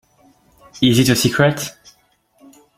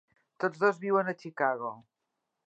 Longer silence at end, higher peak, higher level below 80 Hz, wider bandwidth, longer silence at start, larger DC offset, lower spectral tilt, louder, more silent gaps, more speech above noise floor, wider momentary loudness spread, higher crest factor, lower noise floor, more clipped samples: first, 1.05 s vs 0.65 s; first, 0 dBFS vs -12 dBFS; first, -48 dBFS vs -88 dBFS; first, 16.5 kHz vs 8 kHz; first, 0.75 s vs 0.4 s; neither; second, -4.5 dB/octave vs -7 dB/octave; first, -15 LUFS vs -30 LUFS; neither; second, 43 dB vs 54 dB; first, 12 LU vs 9 LU; about the same, 18 dB vs 20 dB; second, -58 dBFS vs -84 dBFS; neither